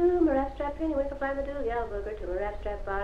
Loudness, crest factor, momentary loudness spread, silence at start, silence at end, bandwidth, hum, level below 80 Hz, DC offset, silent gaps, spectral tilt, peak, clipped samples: -31 LUFS; 14 dB; 9 LU; 0 s; 0 s; 6.8 kHz; none; -40 dBFS; under 0.1%; none; -8 dB/octave; -14 dBFS; under 0.1%